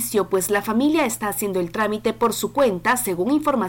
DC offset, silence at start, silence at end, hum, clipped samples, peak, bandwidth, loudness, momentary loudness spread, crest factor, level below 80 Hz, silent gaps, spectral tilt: under 0.1%; 0 s; 0 s; none; under 0.1%; -10 dBFS; 17 kHz; -21 LUFS; 4 LU; 10 dB; -52 dBFS; none; -4 dB/octave